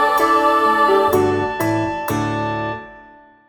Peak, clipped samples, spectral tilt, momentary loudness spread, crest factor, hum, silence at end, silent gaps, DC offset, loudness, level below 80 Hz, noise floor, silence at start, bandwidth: -4 dBFS; under 0.1%; -5.5 dB/octave; 9 LU; 14 dB; none; 0.45 s; none; under 0.1%; -17 LUFS; -48 dBFS; -45 dBFS; 0 s; 17.5 kHz